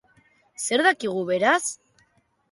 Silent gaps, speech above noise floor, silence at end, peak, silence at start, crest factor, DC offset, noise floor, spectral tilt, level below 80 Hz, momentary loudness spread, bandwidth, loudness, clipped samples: none; 43 dB; 0.75 s; -6 dBFS; 0.6 s; 20 dB; under 0.1%; -65 dBFS; -2.5 dB/octave; -74 dBFS; 11 LU; 11.5 kHz; -22 LUFS; under 0.1%